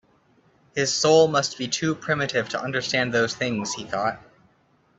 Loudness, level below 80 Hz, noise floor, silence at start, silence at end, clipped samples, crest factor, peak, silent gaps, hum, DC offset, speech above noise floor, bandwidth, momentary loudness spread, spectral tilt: -23 LUFS; -62 dBFS; -62 dBFS; 0.75 s; 0.8 s; under 0.1%; 20 dB; -6 dBFS; none; none; under 0.1%; 39 dB; 8.4 kHz; 11 LU; -3.5 dB/octave